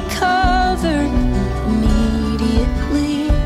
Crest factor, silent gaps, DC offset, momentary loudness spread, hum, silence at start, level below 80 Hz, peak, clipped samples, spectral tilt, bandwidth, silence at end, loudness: 12 dB; none; under 0.1%; 4 LU; none; 0 s; -20 dBFS; -4 dBFS; under 0.1%; -6 dB/octave; 15 kHz; 0 s; -17 LUFS